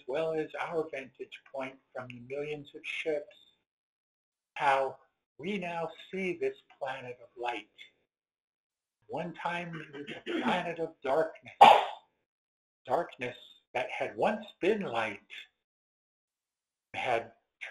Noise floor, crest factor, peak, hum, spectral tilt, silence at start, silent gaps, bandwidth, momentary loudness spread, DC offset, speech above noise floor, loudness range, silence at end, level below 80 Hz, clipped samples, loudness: under -90 dBFS; 30 dB; -4 dBFS; none; -5 dB/octave; 0.1 s; 3.71-4.32 s, 5.26-5.36 s, 8.40-8.70 s, 12.26-12.85 s, 13.67-13.74 s, 15.64-16.28 s; 12 kHz; 16 LU; under 0.1%; over 58 dB; 13 LU; 0 s; -76 dBFS; under 0.1%; -32 LUFS